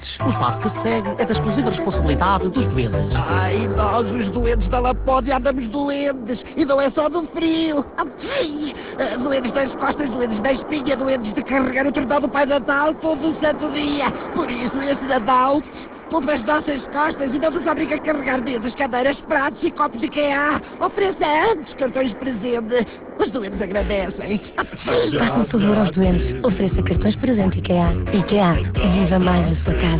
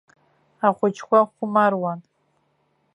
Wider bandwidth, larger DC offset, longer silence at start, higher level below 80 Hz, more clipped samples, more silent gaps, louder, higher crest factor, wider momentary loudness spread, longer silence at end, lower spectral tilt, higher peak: second, 4 kHz vs 10.5 kHz; neither; second, 0 s vs 0.6 s; first, -32 dBFS vs -76 dBFS; neither; neither; about the same, -20 LUFS vs -21 LUFS; second, 14 dB vs 20 dB; second, 6 LU vs 9 LU; second, 0 s vs 0.95 s; first, -10.5 dB/octave vs -7 dB/octave; about the same, -6 dBFS vs -4 dBFS